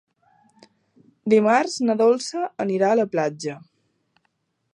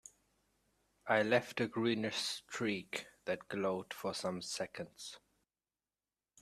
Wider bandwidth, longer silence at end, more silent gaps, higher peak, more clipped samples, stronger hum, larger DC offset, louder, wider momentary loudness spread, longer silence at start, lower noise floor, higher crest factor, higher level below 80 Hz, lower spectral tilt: second, 11 kHz vs 14.5 kHz; about the same, 1.15 s vs 1.25 s; neither; first, -6 dBFS vs -16 dBFS; neither; neither; neither; first, -21 LUFS vs -38 LUFS; about the same, 15 LU vs 14 LU; first, 1.25 s vs 1.05 s; second, -72 dBFS vs under -90 dBFS; second, 18 dB vs 24 dB; about the same, -74 dBFS vs -78 dBFS; about the same, -5 dB/octave vs -4 dB/octave